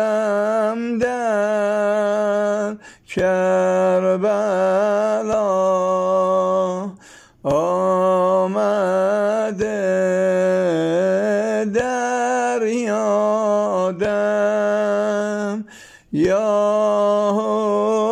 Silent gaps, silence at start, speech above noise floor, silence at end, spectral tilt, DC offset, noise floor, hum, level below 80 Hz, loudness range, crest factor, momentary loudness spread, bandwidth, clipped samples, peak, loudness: none; 0 s; 28 dB; 0 s; -6 dB/octave; under 0.1%; -46 dBFS; none; -56 dBFS; 2 LU; 10 dB; 5 LU; 11 kHz; under 0.1%; -8 dBFS; -19 LUFS